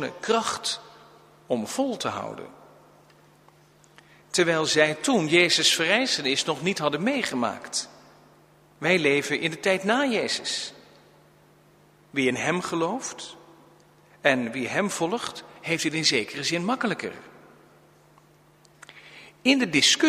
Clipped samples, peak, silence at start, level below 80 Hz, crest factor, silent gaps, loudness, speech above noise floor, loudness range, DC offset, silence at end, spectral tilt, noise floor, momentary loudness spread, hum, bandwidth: under 0.1%; -4 dBFS; 0 s; -70 dBFS; 24 dB; none; -24 LUFS; 32 dB; 9 LU; under 0.1%; 0 s; -3 dB/octave; -57 dBFS; 15 LU; none; 15.5 kHz